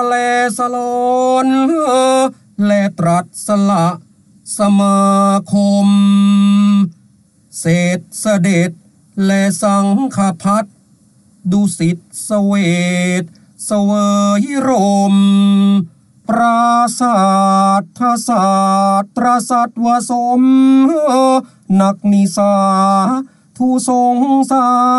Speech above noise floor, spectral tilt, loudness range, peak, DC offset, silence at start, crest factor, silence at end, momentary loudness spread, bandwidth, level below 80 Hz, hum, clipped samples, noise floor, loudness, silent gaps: 38 dB; -6 dB/octave; 4 LU; -2 dBFS; under 0.1%; 0 s; 10 dB; 0 s; 8 LU; 12 kHz; -58 dBFS; none; under 0.1%; -50 dBFS; -13 LUFS; none